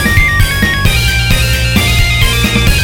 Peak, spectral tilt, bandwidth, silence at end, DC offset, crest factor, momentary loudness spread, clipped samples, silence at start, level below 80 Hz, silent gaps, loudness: 0 dBFS; -3.5 dB/octave; 17.5 kHz; 0 s; under 0.1%; 10 dB; 2 LU; under 0.1%; 0 s; -14 dBFS; none; -10 LUFS